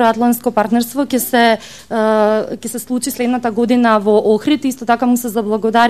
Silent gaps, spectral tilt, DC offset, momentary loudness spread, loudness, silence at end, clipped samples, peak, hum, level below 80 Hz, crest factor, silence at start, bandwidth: none; -4 dB/octave; 0.5%; 8 LU; -15 LUFS; 0 s; under 0.1%; 0 dBFS; none; -54 dBFS; 14 dB; 0 s; 14.5 kHz